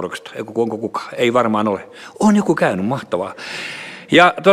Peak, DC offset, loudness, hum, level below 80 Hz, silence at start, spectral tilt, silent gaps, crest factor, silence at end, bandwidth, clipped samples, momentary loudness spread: 0 dBFS; under 0.1%; -18 LUFS; none; -58 dBFS; 0 s; -5.5 dB/octave; none; 18 dB; 0 s; 13.5 kHz; under 0.1%; 15 LU